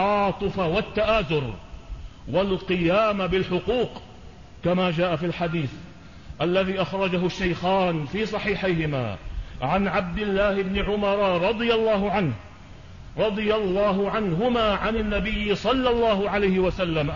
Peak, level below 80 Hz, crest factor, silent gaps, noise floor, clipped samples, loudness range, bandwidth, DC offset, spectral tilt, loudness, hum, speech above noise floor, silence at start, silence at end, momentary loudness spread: -10 dBFS; -40 dBFS; 14 dB; none; -44 dBFS; under 0.1%; 3 LU; 7.4 kHz; 0.3%; -7 dB/octave; -24 LUFS; none; 21 dB; 0 s; 0 s; 9 LU